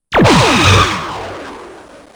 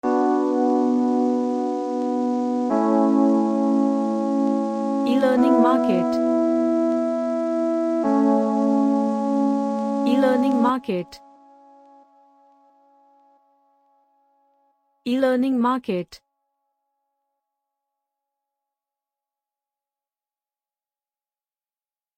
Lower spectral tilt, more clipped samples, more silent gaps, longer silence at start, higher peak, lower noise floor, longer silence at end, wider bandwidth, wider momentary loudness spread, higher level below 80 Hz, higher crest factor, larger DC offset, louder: second, -4.5 dB/octave vs -7 dB/octave; neither; neither; about the same, 0.1 s vs 0.05 s; first, 0 dBFS vs -6 dBFS; second, -36 dBFS vs under -90 dBFS; second, 0.4 s vs 6 s; first, over 20 kHz vs 9.8 kHz; first, 19 LU vs 7 LU; first, -30 dBFS vs -70 dBFS; about the same, 14 dB vs 16 dB; neither; first, -10 LUFS vs -21 LUFS